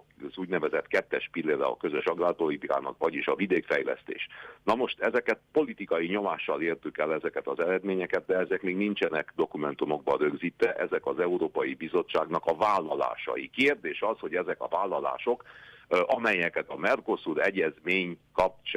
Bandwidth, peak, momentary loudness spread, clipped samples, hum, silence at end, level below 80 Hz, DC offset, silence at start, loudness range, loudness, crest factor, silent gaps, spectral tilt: 11 kHz; -14 dBFS; 6 LU; under 0.1%; none; 0 s; -66 dBFS; under 0.1%; 0.2 s; 1 LU; -29 LUFS; 14 dB; none; -6 dB/octave